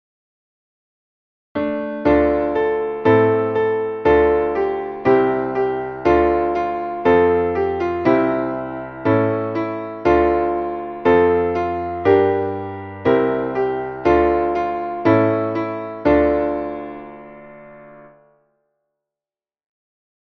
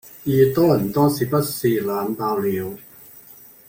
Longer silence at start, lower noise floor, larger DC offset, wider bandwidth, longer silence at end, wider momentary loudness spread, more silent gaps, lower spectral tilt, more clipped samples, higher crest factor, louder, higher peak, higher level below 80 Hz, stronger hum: first, 1.55 s vs 0.05 s; first, under -90 dBFS vs -46 dBFS; neither; second, 6.2 kHz vs 17 kHz; first, 2.25 s vs 0.5 s; about the same, 10 LU vs 9 LU; neither; first, -9 dB/octave vs -6.5 dB/octave; neither; about the same, 16 dB vs 18 dB; about the same, -18 LUFS vs -20 LUFS; about the same, -2 dBFS vs -4 dBFS; first, -42 dBFS vs -54 dBFS; neither